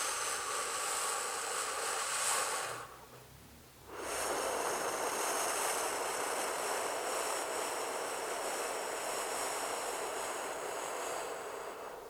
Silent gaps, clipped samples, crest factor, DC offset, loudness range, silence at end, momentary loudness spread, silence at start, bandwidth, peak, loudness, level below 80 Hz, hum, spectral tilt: none; under 0.1%; 18 dB; under 0.1%; 3 LU; 0 s; 11 LU; 0 s; over 20 kHz; -20 dBFS; -36 LUFS; -70 dBFS; none; 0 dB/octave